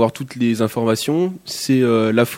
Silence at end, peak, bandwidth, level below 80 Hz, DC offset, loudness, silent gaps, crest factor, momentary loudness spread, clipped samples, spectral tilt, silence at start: 0 s; 0 dBFS; 17 kHz; -62 dBFS; under 0.1%; -18 LUFS; none; 18 dB; 6 LU; under 0.1%; -5.5 dB/octave; 0 s